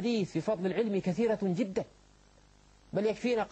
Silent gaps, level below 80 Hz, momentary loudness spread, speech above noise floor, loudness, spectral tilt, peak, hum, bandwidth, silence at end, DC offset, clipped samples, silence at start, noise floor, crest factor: none; -64 dBFS; 6 LU; 30 dB; -32 LUFS; -7 dB/octave; -18 dBFS; 50 Hz at -55 dBFS; 8.6 kHz; 0.05 s; under 0.1%; under 0.1%; 0 s; -61 dBFS; 14 dB